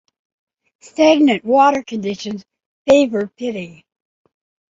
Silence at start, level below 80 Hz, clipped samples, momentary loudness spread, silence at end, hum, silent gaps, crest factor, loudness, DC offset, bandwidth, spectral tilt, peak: 1 s; -58 dBFS; under 0.1%; 17 LU; 1 s; none; 2.66-2.85 s; 16 dB; -16 LUFS; under 0.1%; 7.8 kHz; -5 dB/octave; -2 dBFS